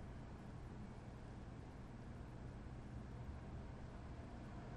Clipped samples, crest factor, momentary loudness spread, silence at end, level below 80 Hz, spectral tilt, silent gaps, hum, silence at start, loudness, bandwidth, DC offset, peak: under 0.1%; 12 dB; 2 LU; 0 s; -58 dBFS; -7.5 dB/octave; none; none; 0 s; -54 LUFS; 10.5 kHz; under 0.1%; -40 dBFS